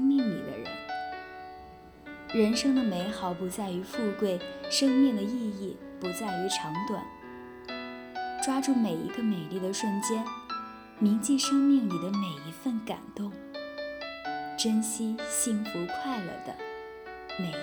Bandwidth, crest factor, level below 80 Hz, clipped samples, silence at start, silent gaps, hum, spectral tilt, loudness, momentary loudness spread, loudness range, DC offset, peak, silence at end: over 20 kHz; 16 dB; -64 dBFS; under 0.1%; 0 s; none; none; -4 dB/octave; -30 LUFS; 15 LU; 4 LU; under 0.1%; -14 dBFS; 0 s